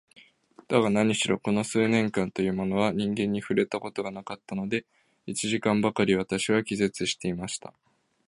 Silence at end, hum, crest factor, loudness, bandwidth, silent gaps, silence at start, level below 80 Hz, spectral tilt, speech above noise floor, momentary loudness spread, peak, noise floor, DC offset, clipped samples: 0.6 s; none; 20 dB; -27 LUFS; 11.5 kHz; none; 0.7 s; -60 dBFS; -5 dB/octave; 30 dB; 10 LU; -6 dBFS; -56 dBFS; under 0.1%; under 0.1%